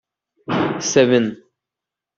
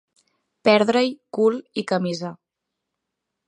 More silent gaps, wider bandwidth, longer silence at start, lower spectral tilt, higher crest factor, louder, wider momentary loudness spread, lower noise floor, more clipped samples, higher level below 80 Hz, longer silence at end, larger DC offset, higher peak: neither; second, 7.8 kHz vs 10.5 kHz; second, 0.5 s vs 0.65 s; about the same, -4.5 dB/octave vs -5.5 dB/octave; about the same, 18 dB vs 20 dB; first, -18 LUFS vs -21 LUFS; about the same, 11 LU vs 12 LU; first, -86 dBFS vs -82 dBFS; neither; first, -62 dBFS vs -74 dBFS; second, 0.85 s vs 1.15 s; neither; about the same, -2 dBFS vs -2 dBFS